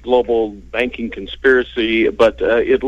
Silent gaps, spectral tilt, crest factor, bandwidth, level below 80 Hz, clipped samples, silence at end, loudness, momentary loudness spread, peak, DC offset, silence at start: none; -5.5 dB/octave; 14 dB; 8.2 kHz; -38 dBFS; under 0.1%; 0 s; -16 LUFS; 8 LU; -2 dBFS; under 0.1%; 0.05 s